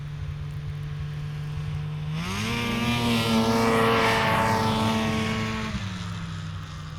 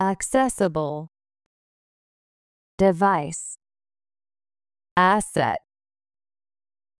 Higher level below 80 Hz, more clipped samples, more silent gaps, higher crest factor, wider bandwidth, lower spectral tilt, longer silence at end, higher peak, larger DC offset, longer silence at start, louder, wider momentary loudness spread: first, -44 dBFS vs -54 dBFS; neither; second, none vs 1.46-2.78 s, 4.91-4.96 s; about the same, 16 dB vs 20 dB; first, 18.5 kHz vs 12 kHz; about the same, -5 dB/octave vs -5 dB/octave; second, 0 s vs 1.4 s; second, -10 dBFS vs -6 dBFS; neither; about the same, 0 s vs 0 s; second, -26 LUFS vs -22 LUFS; about the same, 13 LU vs 14 LU